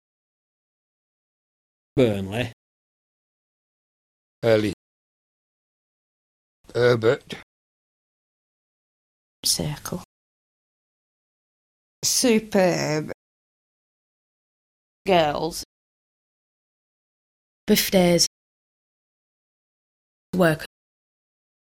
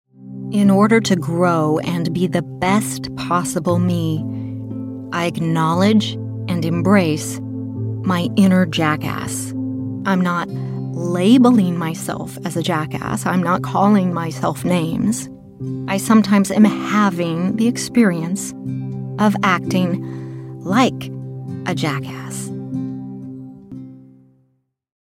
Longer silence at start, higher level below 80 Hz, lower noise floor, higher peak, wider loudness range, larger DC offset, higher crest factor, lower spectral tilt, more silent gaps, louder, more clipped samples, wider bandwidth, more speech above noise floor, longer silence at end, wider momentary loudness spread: first, 1.95 s vs 0.2 s; about the same, -56 dBFS vs -54 dBFS; first, under -90 dBFS vs -65 dBFS; second, -4 dBFS vs 0 dBFS; about the same, 6 LU vs 5 LU; neither; about the same, 22 dB vs 18 dB; second, -4 dB/octave vs -6 dB/octave; first, 2.53-4.42 s, 4.73-6.64 s, 7.43-9.43 s, 10.05-12.02 s, 13.14-15.05 s, 15.65-17.67 s, 18.27-20.33 s vs none; second, -22 LUFS vs -18 LUFS; neither; about the same, 16 kHz vs 16 kHz; first, over 69 dB vs 48 dB; about the same, 0.95 s vs 1.05 s; first, 18 LU vs 14 LU